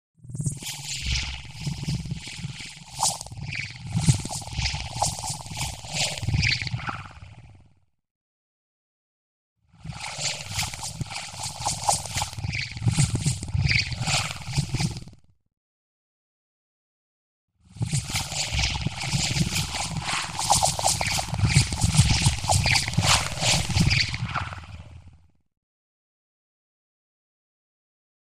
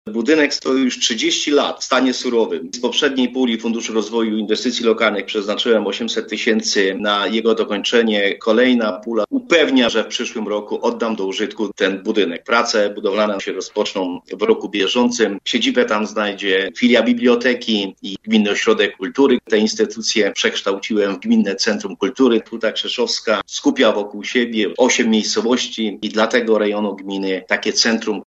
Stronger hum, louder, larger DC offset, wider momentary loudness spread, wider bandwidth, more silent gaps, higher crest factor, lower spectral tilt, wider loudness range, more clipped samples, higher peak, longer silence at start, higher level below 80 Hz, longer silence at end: neither; second, -25 LUFS vs -17 LUFS; first, 0.3% vs under 0.1%; first, 13 LU vs 7 LU; first, 15.5 kHz vs 8.2 kHz; first, 8.11-9.56 s, 15.57-17.48 s vs none; first, 24 dB vs 18 dB; about the same, -3 dB/octave vs -3 dB/octave; first, 13 LU vs 2 LU; neither; second, -4 dBFS vs 0 dBFS; about the same, 0.15 s vs 0.05 s; first, -40 dBFS vs -64 dBFS; first, 2.75 s vs 0.05 s